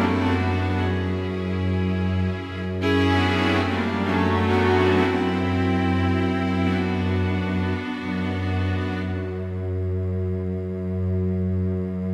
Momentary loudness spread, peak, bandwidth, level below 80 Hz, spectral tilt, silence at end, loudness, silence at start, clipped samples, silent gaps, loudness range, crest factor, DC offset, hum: 8 LU; -8 dBFS; 8.6 kHz; -46 dBFS; -7.5 dB/octave; 0 s; -23 LUFS; 0 s; under 0.1%; none; 5 LU; 14 dB; under 0.1%; none